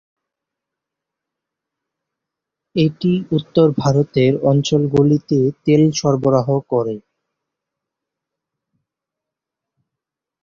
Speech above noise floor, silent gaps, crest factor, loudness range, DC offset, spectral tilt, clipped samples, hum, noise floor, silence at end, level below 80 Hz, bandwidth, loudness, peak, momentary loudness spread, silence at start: 69 dB; none; 18 dB; 10 LU; under 0.1%; -7 dB/octave; under 0.1%; none; -84 dBFS; 3.45 s; -54 dBFS; 7.4 kHz; -16 LUFS; -2 dBFS; 6 LU; 2.75 s